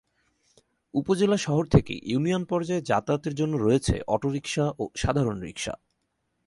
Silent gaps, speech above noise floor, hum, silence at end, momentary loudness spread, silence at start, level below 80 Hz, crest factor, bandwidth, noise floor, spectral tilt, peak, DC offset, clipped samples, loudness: none; 51 dB; none; 0.7 s; 9 LU; 0.95 s; -44 dBFS; 22 dB; 11.5 kHz; -76 dBFS; -6 dB/octave; -4 dBFS; under 0.1%; under 0.1%; -26 LUFS